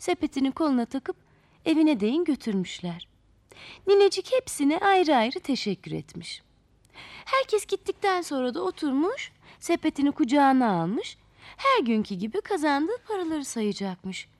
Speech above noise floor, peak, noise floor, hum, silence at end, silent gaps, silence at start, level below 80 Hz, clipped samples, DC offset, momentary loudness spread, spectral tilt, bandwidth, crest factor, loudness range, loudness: 34 dB; -10 dBFS; -59 dBFS; none; 0.15 s; none; 0 s; -62 dBFS; under 0.1%; under 0.1%; 16 LU; -5 dB/octave; 13.5 kHz; 16 dB; 4 LU; -26 LUFS